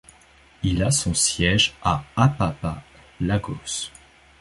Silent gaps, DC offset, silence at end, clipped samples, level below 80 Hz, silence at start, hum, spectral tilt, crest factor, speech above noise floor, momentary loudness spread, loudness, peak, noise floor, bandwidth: none; under 0.1%; 0.5 s; under 0.1%; -40 dBFS; 0.6 s; none; -3.5 dB/octave; 22 dB; 31 dB; 12 LU; -22 LUFS; -2 dBFS; -53 dBFS; 12 kHz